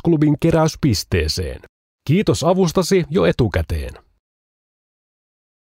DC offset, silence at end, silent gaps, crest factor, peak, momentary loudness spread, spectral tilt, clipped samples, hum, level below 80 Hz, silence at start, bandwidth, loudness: under 0.1%; 1.8 s; 1.69-1.99 s; 14 dB; -4 dBFS; 12 LU; -6 dB/octave; under 0.1%; none; -34 dBFS; 0.05 s; 16 kHz; -18 LUFS